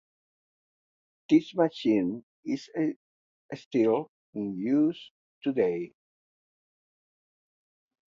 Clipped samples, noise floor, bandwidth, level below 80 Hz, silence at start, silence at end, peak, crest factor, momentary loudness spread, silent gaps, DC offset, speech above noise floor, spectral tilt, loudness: under 0.1%; under -90 dBFS; 7.4 kHz; -74 dBFS; 1.3 s; 2.25 s; -10 dBFS; 20 dB; 16 LU; 2.23-2.43 s, 2.96-3.49 s, 3.66-3.71 s, 4.09-4.33 s, 5.11-5.41 s; under 0.1%; over 63 dB; -7.5 dB/octave; -28 LUFS